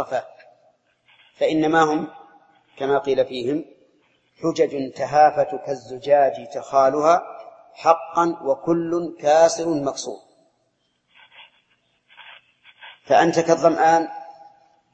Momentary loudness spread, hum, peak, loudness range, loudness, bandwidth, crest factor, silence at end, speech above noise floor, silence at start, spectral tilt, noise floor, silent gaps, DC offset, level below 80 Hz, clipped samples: 14 LU; none; -2 dBFS; 5 LU; -20 LUFS; 8.6 kHz; 20 dB; 0.6 s; 50 dB; 0 s; -5 dB/octave; -69 dBFS; none; under 0.1%; -66 dBFS; under 0.1%